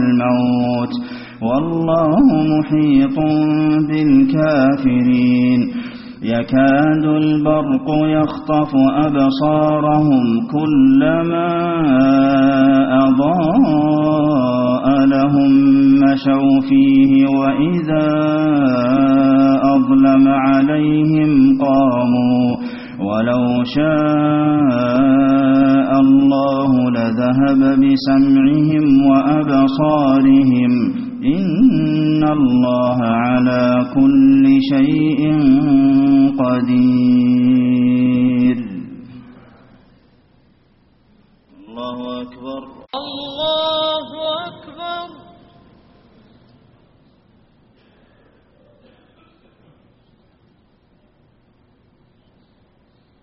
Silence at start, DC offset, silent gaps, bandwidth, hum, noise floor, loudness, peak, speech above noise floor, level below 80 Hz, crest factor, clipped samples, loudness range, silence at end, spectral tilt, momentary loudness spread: 0 s; under 0.1%; none; 5.8 kHz; none; -55 dBFS; -14 LUFS; -2 dBFS; 42 dB; -46 dBFS; 12 dB; under 0.1%; 10 LU; 8.1 s; -6.5 dB/octave; 10 LU